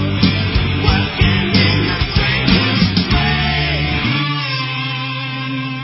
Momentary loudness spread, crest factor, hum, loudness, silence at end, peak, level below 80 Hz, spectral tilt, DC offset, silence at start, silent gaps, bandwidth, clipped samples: 7 LU; 16 dB; none; -15 LUFS; 0 s; 0 dBFS; -24 dBFS; -9 dB/octave; under 0.1%; 0 s; none; 5.8 kHz; under 0.1%